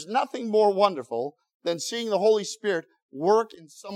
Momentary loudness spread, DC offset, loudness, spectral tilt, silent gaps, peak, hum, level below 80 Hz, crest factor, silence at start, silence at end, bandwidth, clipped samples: 13 LU; under 0.1%; -25 LUFS; -4 dB/octave; 1.54-1.60 s, 3.02-3.09 s; -6 dBFS; none; -90 dBFS; 20 dB; 0 s; 0 s; 14 kHz; under 0.1%